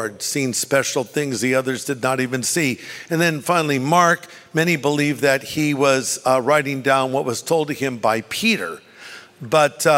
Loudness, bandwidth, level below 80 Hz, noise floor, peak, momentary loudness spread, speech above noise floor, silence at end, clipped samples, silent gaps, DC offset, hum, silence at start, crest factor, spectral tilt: -19 LUFS; 16 kHz; -64 dBFS; -41 dBFS; -2 dBFS; 7 LU; 21 dB; 0 s; under 0.1%; none; under 0.1%; none; 0 s; 18 dB; -4 dB/octave